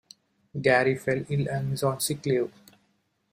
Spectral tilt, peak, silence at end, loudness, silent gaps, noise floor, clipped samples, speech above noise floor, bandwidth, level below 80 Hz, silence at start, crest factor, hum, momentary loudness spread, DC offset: -5 dB/octave; -8 dBFS; 0.85 s; -26 LUFS; none; -71 dBFS; under 0.1%; 46 dB; 15.5 kHz; -62 dBFS; 0.55 s; 20 dB; none; 7 LU; under 0.1%